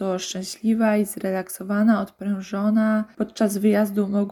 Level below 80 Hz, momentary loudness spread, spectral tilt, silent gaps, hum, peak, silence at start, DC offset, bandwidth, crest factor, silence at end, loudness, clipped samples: -64 dBFS; 8 LU; -6 dB/octave; none; none; -8 dBFS; 0 s; under 0.1%; 18 kHz; 14 dB; 0 s; -23 LUFS; under 0.1%